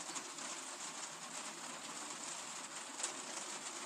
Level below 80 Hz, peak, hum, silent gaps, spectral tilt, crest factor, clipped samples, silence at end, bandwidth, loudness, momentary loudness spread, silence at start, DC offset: under -90 dBFS; -22 dBFS; none; none; 0 dB/octave; 24 dB; under 0.1%; 0 s; 15.5 kHz; -44 LUFS; 4 LU; 0 s; under 0.1%